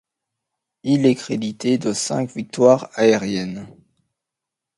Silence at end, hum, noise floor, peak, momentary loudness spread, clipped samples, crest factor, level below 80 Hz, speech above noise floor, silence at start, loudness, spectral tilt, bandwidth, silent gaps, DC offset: 1.05 s; none; -85 dBFS; 0 dBFS; 12 LU; under 0.1%; 20 dB; -62 dBFS; 66 dB; 0.85 s; -19 LUFS; -5 dB/octave; 11.5 kHz; none; under 0.1%